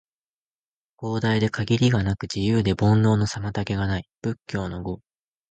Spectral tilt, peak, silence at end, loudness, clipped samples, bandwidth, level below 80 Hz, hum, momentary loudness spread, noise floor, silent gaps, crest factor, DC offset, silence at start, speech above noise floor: -6.5 dB/octave; -8 dBFS; 0.55 s; -24 LUFS; under 0.1%; 8.8 kHz; -44 dBFS; none; 12 LU; under -90 dBFS; 4.17-4.22 s; 16 dB; under 0.1%; 1 s; over 67 dB